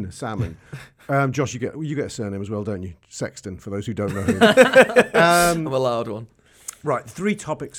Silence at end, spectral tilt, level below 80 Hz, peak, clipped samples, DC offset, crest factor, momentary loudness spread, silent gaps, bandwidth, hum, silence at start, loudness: 0 s; -4.5 dB/octave; -50 dBFS; 0 dBFS; under 0.1%; under 0.1%; 20 dB; 21 LU; none; 18.5 kHz; none; 0 s; -20 LUFS